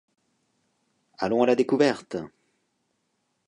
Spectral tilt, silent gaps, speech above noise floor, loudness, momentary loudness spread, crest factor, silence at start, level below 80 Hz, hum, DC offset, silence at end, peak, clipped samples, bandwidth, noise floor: -6 dB/octave; none; 52 dB; -24 LUFS; 14 LU; 22 dB; 1.2 s; -68 dBFS; none; under 0.1%; 1.2 s; -6 dBFS; under 0.1%; 10.5 kHz; -75 dBFS